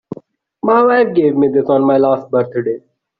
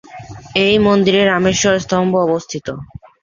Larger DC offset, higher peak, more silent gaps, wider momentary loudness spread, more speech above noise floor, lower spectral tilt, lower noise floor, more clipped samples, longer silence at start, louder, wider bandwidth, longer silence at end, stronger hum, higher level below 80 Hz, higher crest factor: neither; about the same, -2 dBFS vs -2 dBFS; neither; second, 13 LU vs 17 LU; first, 29 dB vs 20 dB; first, -6 dB/octave vs -4.5 dB/octave; first, -42 dBFS vs -34 dBFS; neither; about the same, 0.1 s vs 0.1 s; about the same, -14 LUFS vs -14 LUFS; second, 5 kHz vs 7.4 kHz; about the same, 0.4 s vs 0.35 s; neither; second, -58 dBFS vs -44 dBFS; about the same, 12 dB vs 14 dB